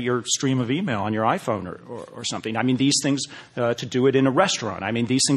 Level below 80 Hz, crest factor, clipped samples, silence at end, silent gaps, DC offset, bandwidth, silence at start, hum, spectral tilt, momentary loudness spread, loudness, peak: -58 dBFS; 20 dB; under 0.1%; 0 s; none; under 0.1%; 12.5 kHz; 0 s; none; -4 dB/octave; 10 LU; -23 LUFS; -4 dBFS